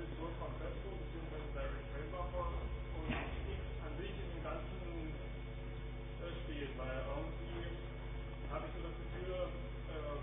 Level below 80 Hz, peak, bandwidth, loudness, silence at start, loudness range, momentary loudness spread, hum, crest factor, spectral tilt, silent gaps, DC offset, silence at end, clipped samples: -46 dBFS; -28 dBFS; 3.7 kHz; -45 LUFS; 0 s; 2 LU; 5 LU; none; 16 dB; -5 dB/octave; none; under 0.1%; 0 s; under 0.1%